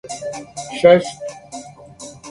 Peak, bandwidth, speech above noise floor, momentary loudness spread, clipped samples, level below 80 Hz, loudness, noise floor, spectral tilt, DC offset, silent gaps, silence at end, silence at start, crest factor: 0 dBFS; 11.5 kHz; 21 dB; 23 LU; under 0.1%; -54 dBFS; -16 LUFS; -39 dBFS; -4.5 dB/octave; under 0.1%; none; 0 s; 0.05 s; 20 dB